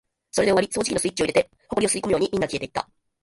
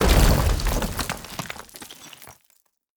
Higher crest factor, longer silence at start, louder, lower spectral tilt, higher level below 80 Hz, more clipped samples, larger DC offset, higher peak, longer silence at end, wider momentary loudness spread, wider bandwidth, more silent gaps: about the same, 18 dB vs 20 dB; first, 0.35 s vs 0 s; about the same, -23 LUFS vs -24 LUFS; about the same, -3.5 dB/octave vs -4.5 dB/octave; second, -52 dBFS vs -26 dBFS; neither; neither; about the same, -6 dBFS vs -4 dBFS; second, 0.4 s vs 0.7 s; second, 9 LU vs 23 LU; second, 11.5 kHz vs over 20 kHz; neither